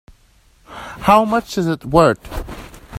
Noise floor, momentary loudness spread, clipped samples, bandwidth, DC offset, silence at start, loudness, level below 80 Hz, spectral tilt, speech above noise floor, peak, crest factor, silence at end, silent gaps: -53 dBFS; 20 LU; under 0.1%; 16 kHz; under 0.1%; 0.7 s; -16 LUFS; -36 dBFS; -6 dB/octave; 38 dB; 0 dBFS; 18 dB; 0 s; none